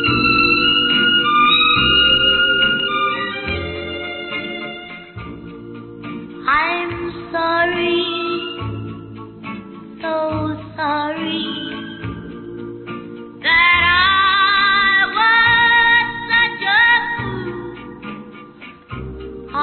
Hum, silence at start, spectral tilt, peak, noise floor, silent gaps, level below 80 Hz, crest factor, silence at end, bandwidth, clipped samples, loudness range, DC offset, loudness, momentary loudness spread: none; 0 s; -9 dB/octave; -4 dBFS; -39 dBFS; none; -42 dBFS; 14 dB; 0 s; 4.5 kHz; under 0.1%; 11 LU; under 0.1%; -14 LUFS; 21 LU